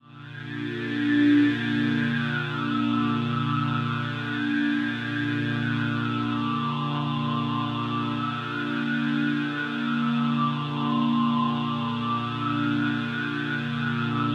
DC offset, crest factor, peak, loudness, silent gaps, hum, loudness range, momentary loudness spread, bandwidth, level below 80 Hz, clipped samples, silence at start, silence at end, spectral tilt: under 0.1%; 14 dB; -12 dBFS; -26 LUFS; none; none; 3 LU; 5 LU; 7.8 kHz; -62 dBFS; under 0.1%; 0.05 s; 0 s; -7 dB/octave